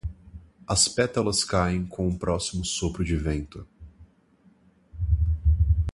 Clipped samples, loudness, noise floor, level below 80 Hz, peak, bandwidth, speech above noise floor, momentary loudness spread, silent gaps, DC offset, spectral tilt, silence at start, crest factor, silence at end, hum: under 0.1%; -25 LUFS; -60 dBFS; -30 dBFS; -8 dBFS; 11.5 kHz; 34 dB; 12 LU; none; under 0.1%; -4.5 dB/octave; 0.05 s; 20 dB; 0 s; none